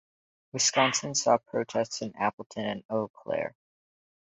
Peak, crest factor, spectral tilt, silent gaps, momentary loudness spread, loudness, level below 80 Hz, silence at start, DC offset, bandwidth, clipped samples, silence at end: -10 dBFS; 22 dB; -2.5 dB/octave; 2.33-2.38 s, 2.46-2.50 s, 2.85-2.89 s, 3.10-3.14 s; 10 LU; -28 LUFS; -70 dBFS; 0.55 s; under 0.1%; 8.4 kHz; under 0.1%; 0.85 s